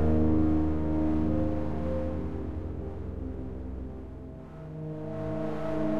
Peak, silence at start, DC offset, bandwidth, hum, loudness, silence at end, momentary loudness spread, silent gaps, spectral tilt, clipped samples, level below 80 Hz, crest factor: -14 dBFS; 0 s; under 0.1%; 5.6 kHz; none; -31 LUFS; 0 s; 16 LU; none; -10 dB/octave; under 0.1%; -38 dBFS; 14 dB